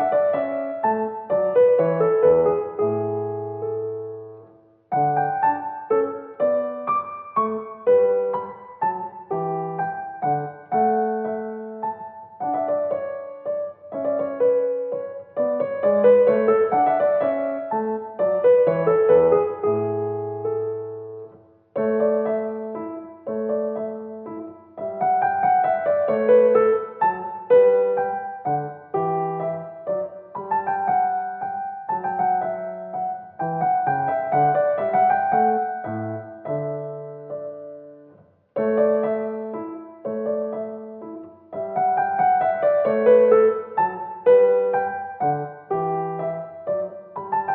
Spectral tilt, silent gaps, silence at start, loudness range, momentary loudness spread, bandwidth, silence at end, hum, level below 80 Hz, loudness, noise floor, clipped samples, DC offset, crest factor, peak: -7 dB/octave; none; 0 s; 7 LU; 16 LU; 3.7 kHz; 0 s; none; -70 dBFS; -22 LUFS; -53 dBFS; under 0.1%; under 0.1%; 18 dB; -4 dBFS